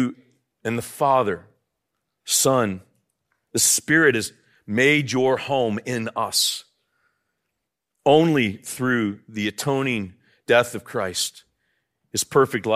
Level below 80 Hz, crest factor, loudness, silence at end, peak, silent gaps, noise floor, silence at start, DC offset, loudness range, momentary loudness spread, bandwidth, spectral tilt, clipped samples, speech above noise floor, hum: -66 dBFS; 20 dB; -21 LUFS; 0 s; -2 dBFS; none; -80 dBFS; 0 s; under 0.1%; 4 LU; 11 LU; 16 kHz; -3.5 dB/octave; under 0.1%; 59 dB; none